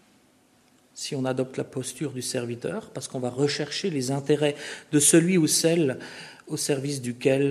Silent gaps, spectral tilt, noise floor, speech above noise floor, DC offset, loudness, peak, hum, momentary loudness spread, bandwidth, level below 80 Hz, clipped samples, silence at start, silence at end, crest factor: none; -4 dB/octave; -61 dBFS; 36 dB; under 0.1%; -25 LUFS; -6 dBFS; none; 15 LU; 13.5 kHz; -70 dBFS; under 0.1%; 0.95 s; 0 s; 20 dB